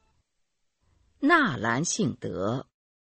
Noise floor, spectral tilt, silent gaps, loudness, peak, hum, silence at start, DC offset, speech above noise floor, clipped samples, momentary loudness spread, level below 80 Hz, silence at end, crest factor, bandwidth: -78 dBFS; -4 dB/octave; none; -26 LUFS; -8 dBFS; none; 1.2 s; under 0.1%; 52 dB; under 0.1%; 10 LU; -64 dBFS; 0.45 s; 22 dB; 8.8 kHz